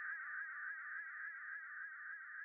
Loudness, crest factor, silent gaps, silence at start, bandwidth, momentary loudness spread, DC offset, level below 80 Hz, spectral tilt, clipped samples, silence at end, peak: -47 LUFS; 12 dB; none; 0 s; 2.8 kHz; 4 LU; under 0.1%; under -90 dBFS; 16 dB/octave; under 0.1%; 0 s; -36 dBFS